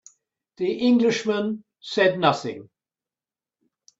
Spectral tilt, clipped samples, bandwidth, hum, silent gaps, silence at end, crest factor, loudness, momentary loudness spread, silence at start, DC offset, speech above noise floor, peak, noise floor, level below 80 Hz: -5 dB/octave; under 0.1%; 7.8 kHz; none; none; 1.35 s; 20 dB; -22 LUFS; 14 LU; 0.6 s; under 0.1%; over 68 dB; -4 dBFS; under -90 dBFS; -68 dBFS